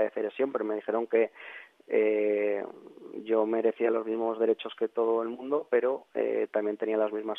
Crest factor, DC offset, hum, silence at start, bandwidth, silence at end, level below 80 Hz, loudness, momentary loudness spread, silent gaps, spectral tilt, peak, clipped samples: 16 dB; under 0.1%; none; 0 s; 3.9 kHz; 0 s; -80 dBFS; -29 LUFS; 9 LU; none; -7.5 dB/octave; -12 dBFS; under 0.1%